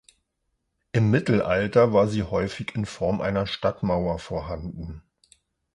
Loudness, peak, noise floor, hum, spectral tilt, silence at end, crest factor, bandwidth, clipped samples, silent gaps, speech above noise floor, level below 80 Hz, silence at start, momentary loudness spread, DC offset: -24 LUFS; -6 dBFS; -76 dBFS; none; -7 dB/octave; 0.75 s; 18 dB; 11 kHz; under 0.1%; none; 53 dB; -46 dBFS; 0.95 s; 14 LU; under 0.1%